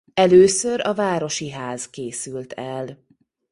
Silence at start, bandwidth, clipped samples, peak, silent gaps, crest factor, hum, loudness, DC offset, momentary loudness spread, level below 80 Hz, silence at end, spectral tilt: 0.15 s; 11.5 kHz; under 0.1%; -2 dBFS; none; 18 dB; none; -20 LUFS; under 0.1%; 17 LU; -58 dBFS; 0.55 s; -4.5 dB/octave